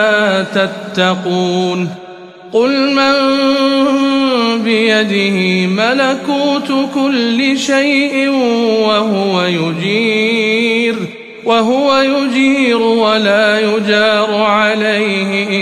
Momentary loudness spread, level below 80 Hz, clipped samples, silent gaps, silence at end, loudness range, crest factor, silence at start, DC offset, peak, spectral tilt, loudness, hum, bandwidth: 4 LU; -60 dBFS; under 0.1%; none; 0 s; 2 LU; 12 dB; 0 s; 0.1%; 0 dBFS; -5 dB/octave; -12 LUFS; none; 12.5 kHz